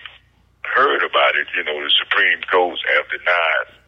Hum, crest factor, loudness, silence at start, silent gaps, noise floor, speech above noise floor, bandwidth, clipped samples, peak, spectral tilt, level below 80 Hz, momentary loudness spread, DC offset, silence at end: none; 12 dB; -16 LUFS; 0.05 s; none; -53 dBFS; 35 dB; 7.2 kHz; under 0.1%; -6 dBFS; -3 dB/octave; -62 dBFS; 5 LU; under 0.1%; 0.25 s